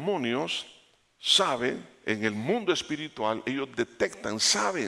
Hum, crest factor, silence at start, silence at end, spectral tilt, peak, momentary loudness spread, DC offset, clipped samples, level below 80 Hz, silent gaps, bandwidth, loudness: none; 20 dB; 0 s; 0 s; -2.5 dB/octave; -10 dBFS; 11 LU; under 0.1%; under 0.1%; -68 dBFS; none; 16 kHz; -28 LUFS